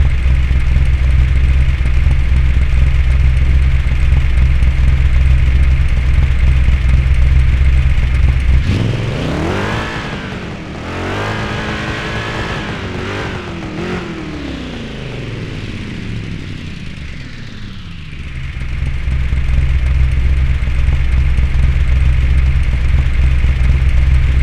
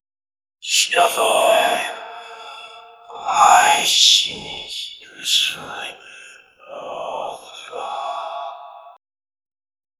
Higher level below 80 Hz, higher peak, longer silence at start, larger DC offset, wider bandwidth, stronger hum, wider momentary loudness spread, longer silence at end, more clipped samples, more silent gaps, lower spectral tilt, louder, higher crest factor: first, -14 dBFS vs -64 dBFS; about the same, 0 dBFS vs 0 dBFS; second, 0 s vs 0.65 s; neither; second, 8.2 kHz vs 16.5 kHz; neither; second, 12 LU vs 23 LU; second, 0 s vs 1.1 s; neither; neither; first, -7 dB/octave vs 1 dB/octave; about the same, -16 LUFS vs -16 LUFS; second, 12 dB vs 20 dB